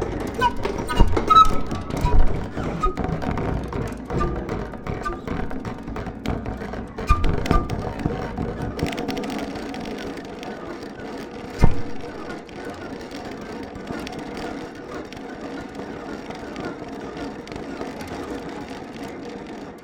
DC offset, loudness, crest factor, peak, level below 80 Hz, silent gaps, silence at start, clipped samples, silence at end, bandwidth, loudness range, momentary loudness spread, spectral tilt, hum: under 0.1%; -26 LUFS; 22 dB; -2 dBFS; -28 dBFS; none; 0 s; under 0.1%; 0 s; 15 kHz; 12 LU; 12 LU; -6.5 dB/octave; none